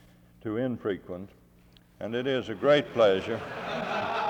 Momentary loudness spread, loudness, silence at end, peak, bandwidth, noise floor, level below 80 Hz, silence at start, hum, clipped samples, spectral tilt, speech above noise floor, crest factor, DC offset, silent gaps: 17 LU; -28 LUFS; 0 s; -10 dBFS; 9 kHz; -58 dBFS; -64 dBFS; 0.45 s; none; under 0.1%; -6 dB/octave; 30 dB; 20 dB; under 0.1%; none